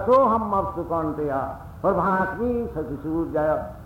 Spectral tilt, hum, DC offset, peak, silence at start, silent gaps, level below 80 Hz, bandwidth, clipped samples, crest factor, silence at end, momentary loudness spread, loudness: -9 dB/octave; none; under 0.1%; -8 dBFS; 0 s; none; -44 dBFS; 16.5 kHz; under 0.1%; 14 dB; 0 s; 9 LU; -24 LUFS